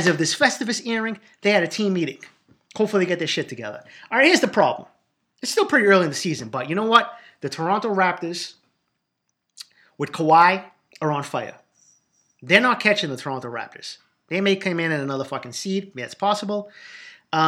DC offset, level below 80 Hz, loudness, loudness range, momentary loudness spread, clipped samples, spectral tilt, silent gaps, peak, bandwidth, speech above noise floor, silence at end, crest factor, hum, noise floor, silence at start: under 0.1%; -76 dBFS; -21 LUFS; 5 LU; 19 LU; under 0.1%; -4 dB/octave; none; 0 dBFS; 15.5 kHz; 55 dB; 0 s; 22 dB; none; -77 dBFS; 0 s